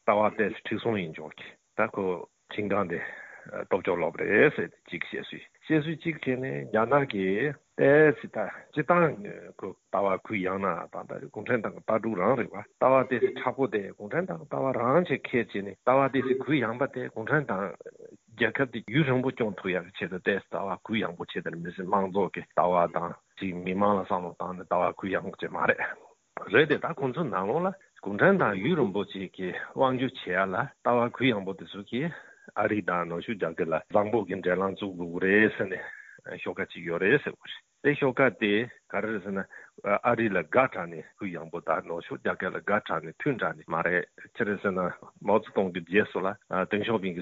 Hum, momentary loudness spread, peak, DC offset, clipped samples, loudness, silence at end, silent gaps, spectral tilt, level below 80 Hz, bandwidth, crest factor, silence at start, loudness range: none; 13 LU; -6 dBFS; under 0.1%; under 0.1%; -28 LUFS; 0 s; none; -4.5 dB/octave; -68 dBFS; 7.6 kHz; 22 dB; 0.05 s; 4 LU